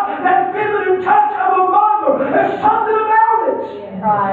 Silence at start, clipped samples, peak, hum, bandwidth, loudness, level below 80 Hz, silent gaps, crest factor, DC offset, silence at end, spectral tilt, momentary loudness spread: 0 s; under 0.1%; -2 dBFS; none; 4.4 kHz; -14 LUFS; -56 dBFS; none; 12 dB; under 0.1%; 0 s; -8 dB/octave; 6 LU